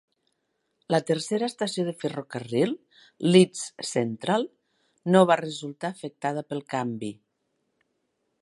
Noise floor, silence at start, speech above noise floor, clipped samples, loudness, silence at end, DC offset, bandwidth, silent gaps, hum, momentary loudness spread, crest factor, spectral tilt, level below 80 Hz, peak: -76 dBFS; 0.9 s; 51 dB; under 0.1%; -26 LUFS; 1.3 s; under 0.1%; 11.5 kHz; none; none; 15 LU; 22 dB; -5.5 dB/octave; -74 dBFS; -4 dBFS